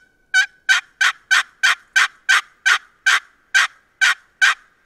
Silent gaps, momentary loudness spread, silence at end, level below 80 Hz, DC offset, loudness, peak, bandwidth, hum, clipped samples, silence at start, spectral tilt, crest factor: none; 3 LU; 0.3 s; -70 dBFS; under 0.1%; -17 LUFS; -2 dBFS; 16 kHz; none; under 0.1%; 0.35 s; 5.5 dB/octave; 18 dB